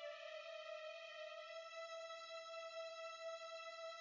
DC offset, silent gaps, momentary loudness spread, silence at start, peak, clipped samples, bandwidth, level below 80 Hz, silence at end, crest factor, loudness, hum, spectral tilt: under 0.1%; none; 2 LU; 0 s; -40 dBFS; under 0.1%; 7.6 kHz; under -90 dBFS; 0 s; 12 dB; -51 LUFS; none; 1.5 dB/octave